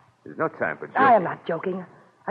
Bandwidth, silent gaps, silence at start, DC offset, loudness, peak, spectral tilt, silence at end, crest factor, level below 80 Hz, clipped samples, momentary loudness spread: 5.2 kHz; none; 0.25 s; under 0.1%; -23 LUFS; -6 dBFS; -8.5 dB/octave; 0 s; 18 dB; -70 dBFS; under 0.1%; 18 LU